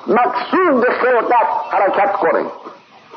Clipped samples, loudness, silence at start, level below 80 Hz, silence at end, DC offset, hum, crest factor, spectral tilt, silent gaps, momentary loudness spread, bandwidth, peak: under 0.1%; -15 LUFS; 0 s; -72 dBFS; 0.4 s; under 0.1%; none; 12 dB; -7 dB/octave; none; 5 LU; 6.2 kHz; -4 dBFS